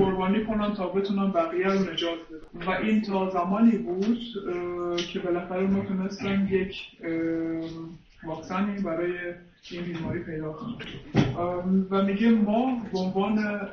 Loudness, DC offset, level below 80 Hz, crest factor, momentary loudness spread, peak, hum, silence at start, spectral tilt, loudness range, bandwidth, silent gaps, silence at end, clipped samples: -27 LUFS; under 0.1%; -52 dBFS; 18 dB; 14 LU; -8 dBFS; none; 0 s; -7 dB/octave; 6 LU; 6.6 kHz; none; 0 s; under 0.1%